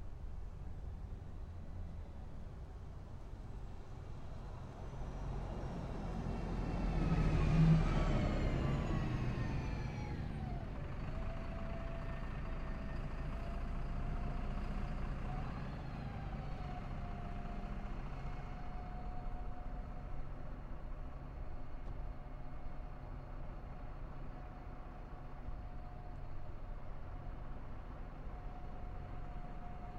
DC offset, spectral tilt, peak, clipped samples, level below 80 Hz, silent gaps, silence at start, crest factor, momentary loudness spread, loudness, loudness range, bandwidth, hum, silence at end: under 0.1%; -8 dB/octave; -20 dBFS; under 0.1%; -44 dBFS; none; 0 s; 20 dB; 14 LU; -44 LUFS; 15 LU; 8.2 kHz; none; 0 s